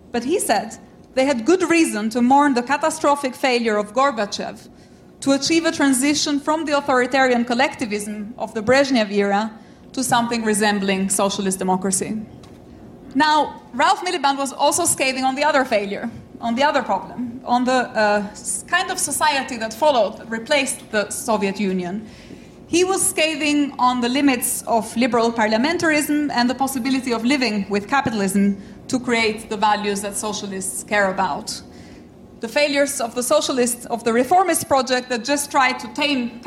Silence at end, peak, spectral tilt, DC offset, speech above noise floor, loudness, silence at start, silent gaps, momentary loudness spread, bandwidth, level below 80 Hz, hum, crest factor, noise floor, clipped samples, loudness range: 0 s; -6 dBFS; -3 dB/octave; under 0.1%; 23 dB; -19 LUFS; 0.15 s; none; 9 LU; 16 kHz; -54 dBFS; none; 14 dB; -42 dBFS; under 0.1%; 3 LU